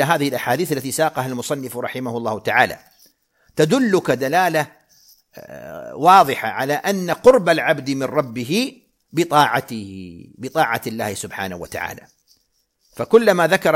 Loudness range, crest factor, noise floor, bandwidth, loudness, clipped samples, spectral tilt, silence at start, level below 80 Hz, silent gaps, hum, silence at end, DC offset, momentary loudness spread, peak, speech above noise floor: 5 LU; 20 dB; -66 dBFS; 16.5 kHz; -18 LUFS; under 0.1%; -4.5 dB/octave; 0 s; -58 dBFS; none; none; 0 s; under 0.1%; 18 LU; 0 dBFS; 48 dB